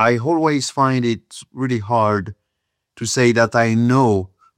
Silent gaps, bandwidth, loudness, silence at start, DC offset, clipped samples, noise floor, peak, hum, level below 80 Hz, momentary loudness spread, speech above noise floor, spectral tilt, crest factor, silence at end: none; 14 kHz; -18 LUFS; 0 s; under 0.1%; under 0.1%; -76 dBFS; -2 dBFS; none; -60 dBFS; 11 LU; 59 dB; -5.5 dB/octave; 16 dB; 0.3 s